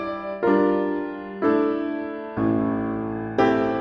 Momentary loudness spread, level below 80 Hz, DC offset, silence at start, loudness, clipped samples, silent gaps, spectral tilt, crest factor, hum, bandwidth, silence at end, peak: 9 LU; -52 dBFS; under 0.1%; 0 s; -23 LUFS; under 0.1%; none; -8.5 dB/octave; 16 dB; none; 6.6 kHz; 0 s; -6 dBFS